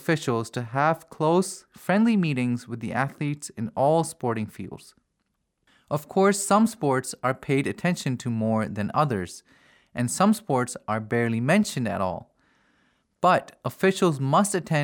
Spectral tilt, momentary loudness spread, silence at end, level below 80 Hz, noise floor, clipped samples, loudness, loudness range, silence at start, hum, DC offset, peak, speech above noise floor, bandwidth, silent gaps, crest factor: -5.5 dB/octave; 11 LU; 0 s; -66 dBFS; -76 dBFS; under 0.1%; -25 LUFS; 3 LU; 0 s; none; under 0.1%; -8 dBFS; 52 dB; over 20 kHz; none; 18 dB